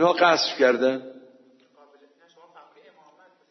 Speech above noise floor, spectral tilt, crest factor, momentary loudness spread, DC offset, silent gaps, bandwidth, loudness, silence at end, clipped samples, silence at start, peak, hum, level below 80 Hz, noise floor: 37 dB; -3.5 dB/octave; 20 dB; 15 LU; under 0.1%; none; 6.2 kHz; -21 LUFS; 2.4 s; under 0.1%; 0 s; -6 dBFS; none; -86 dBFS; -57 dBFS